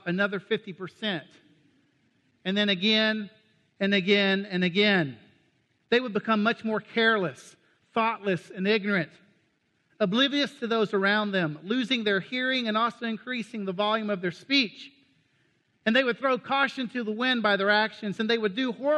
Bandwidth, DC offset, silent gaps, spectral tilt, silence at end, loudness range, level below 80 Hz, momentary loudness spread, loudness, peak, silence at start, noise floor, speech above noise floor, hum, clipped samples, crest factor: 10 kHz; under 0.1%; none; -5.5 dB/octave; 0 s; 3 LU; -78 dBFS; 10 LU; -26 LUFS; -10 dBFS; 0.05 s; -71 dBFS; 44 dB; none; under 0.1%; 18 dB